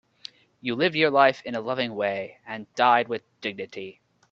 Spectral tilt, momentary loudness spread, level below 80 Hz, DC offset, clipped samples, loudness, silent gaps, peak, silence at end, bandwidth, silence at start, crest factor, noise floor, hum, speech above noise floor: -5.5 dB/octave; 19 LU; -70 dBFS; under 0.1%; under 0.1%; -24 LUFS; none; -4 dBFS; 0.4 s; 7.6 kHz; 0.65 s; 22 dB; -48 dBFS; none; 23 dB